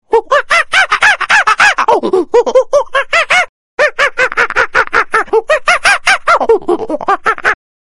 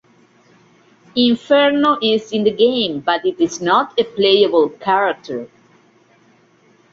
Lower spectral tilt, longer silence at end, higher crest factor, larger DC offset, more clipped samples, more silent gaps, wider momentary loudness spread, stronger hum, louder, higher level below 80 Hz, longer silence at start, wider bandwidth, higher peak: second, -1.5 dB/octave vs -4.5 dB/octave; second, 0.4 s vs 1.45 s; second, 10 dB vs 16 dB; neither; first, 0.5% vs under 0.1%; first, 3.49-3.78 s vs none; about the same, 6 LU vs 7 LU; neither; first, -10 LUFS vs -16 LUFS; first, -42 dBFS vs -62 dBFS; second, 0.1 s vs 1.15 s; first, 15 kHz vs 7.6 kHz; about the same, 0 dBFS vs -2 dBFS